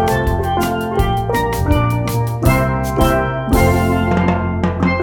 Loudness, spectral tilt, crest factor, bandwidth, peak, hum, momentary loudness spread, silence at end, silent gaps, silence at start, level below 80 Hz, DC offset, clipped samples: -16 LUFS; -6.5 dB/octave; 14 dB; 19.5 kHz; 0 dBFS; none; 4 LU; 0 s; none; 0 s; -24 dBFS; under 0.1%; under 0.1%